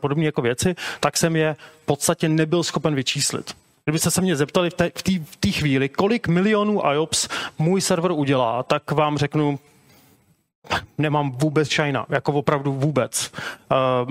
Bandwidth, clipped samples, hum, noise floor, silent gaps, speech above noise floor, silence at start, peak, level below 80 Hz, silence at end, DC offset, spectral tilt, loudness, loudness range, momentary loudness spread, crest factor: 16 kHz; under 0.1%; none; -58 dBFS; 10.55-10.62 s; 37 dB; 0 s; -4 dBFS; -52 dBFS; 0 s; under 0.1%; -4.5 dB/octave; -21 LUFS; 3 LU; 6 LU; 18 dB